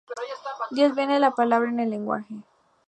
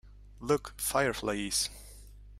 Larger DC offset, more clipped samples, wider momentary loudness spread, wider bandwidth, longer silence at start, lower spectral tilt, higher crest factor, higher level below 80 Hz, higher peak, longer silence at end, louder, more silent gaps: neither; neither; about the same, 14 LU vs 16 LU; second, 8.8 kHz vs 16 kHz; about the same, 0.1 s vs 0.05 s; first, -5.5 dB/octave vs -3 dB/octave; about the same, 18 dB vs 20 dB; second, -80 dBFS vs -52 dBFS; first, -6 dBFS vs -14 dBFS; first, 0.45 s vs 0 s; first, -24 LUFS vs -31 LUFS; neither